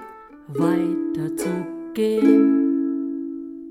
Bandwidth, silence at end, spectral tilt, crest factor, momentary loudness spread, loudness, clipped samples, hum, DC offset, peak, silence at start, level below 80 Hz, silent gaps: 14.5 kHz; 0 s; -7 dB/octave; 18 dB; 16 LU; -21 LUFS; under 0.1%; none; under 0.1%; -4 dBFS; 0 s; -62 dBFS; none